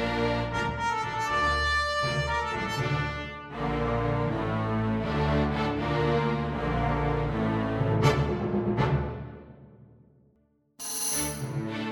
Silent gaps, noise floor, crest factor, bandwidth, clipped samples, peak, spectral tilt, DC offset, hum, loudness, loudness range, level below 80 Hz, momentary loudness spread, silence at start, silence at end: none; -67 dBFS; 18 dB; 19 kHz; under 0.1%; -10 dBFS; -5 dB/octave; under 0.1%; none; -28 LUFS; 3 LU; -40 dBFS; 8 LU; 0 s; 0 s